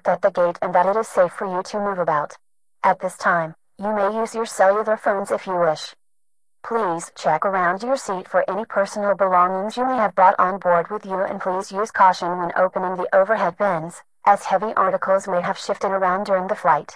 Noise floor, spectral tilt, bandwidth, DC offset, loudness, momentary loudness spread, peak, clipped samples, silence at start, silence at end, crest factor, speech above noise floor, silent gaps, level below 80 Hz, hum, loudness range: -80 dBFS; -5 dB/octave; 11 kHz; under 0.1%; -20 LUFS; 8 LU; -2 dBFS; under 0.1%; 0.05 s; 0 s; 18 dB; 60 dB; none; -64 dBFS; none; 3 LU